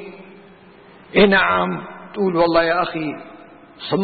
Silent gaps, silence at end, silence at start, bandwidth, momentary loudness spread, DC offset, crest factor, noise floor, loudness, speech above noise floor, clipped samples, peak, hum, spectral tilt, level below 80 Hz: none; 0 s; 0 s; 4.8 kHz; 20 LU; under 0.1%; 18 dB; -45 dBFS; -18 LUFS; 28 dB; under 0.1%; -2 dBFS; none; -10.5 dB/octave; -48 dBFS